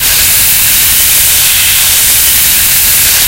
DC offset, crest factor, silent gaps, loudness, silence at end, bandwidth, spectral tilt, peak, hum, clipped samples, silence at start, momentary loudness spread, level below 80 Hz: under 0.1%; 6 dB; none; -3 LUFS; 0 s; over 20 kHz; 1 dB/octave; 0 dBFS; none; 3%; 0 s; 1 LU; -28 dBFS